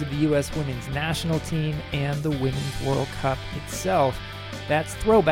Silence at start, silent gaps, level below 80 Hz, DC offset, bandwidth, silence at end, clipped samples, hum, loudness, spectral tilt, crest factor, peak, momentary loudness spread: 0 s; none; -40 dBFS; under 0.1%; 16.5 kHz; 0 s; under 0.1%; none; -26 LUFS; -5.5 dB/octave; 16 dB; -8 dBFS; 7 LU